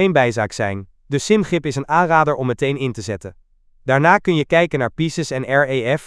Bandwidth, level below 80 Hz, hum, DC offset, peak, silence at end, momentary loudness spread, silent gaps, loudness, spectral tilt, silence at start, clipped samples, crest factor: 11 kHz; -48 dBFS; none; under 0.1%; 0 dBFS; 0 s; 12 LU; none; -18 LUFS; -5.5 dB/octave; 0 s; under 0.1%; 18 dB